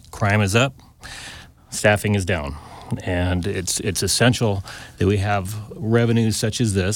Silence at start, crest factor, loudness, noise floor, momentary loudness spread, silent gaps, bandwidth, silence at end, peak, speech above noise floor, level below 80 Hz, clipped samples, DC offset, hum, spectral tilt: 0.15 s; 18 dB; -21 LUFS; -40 dBFS; 17 LU; none; 18 kHz; 0 s; -2 dBFS; 20 dB; -42 dBFS; under 0.1%; under 0.1%; none; -4.5 dB/octave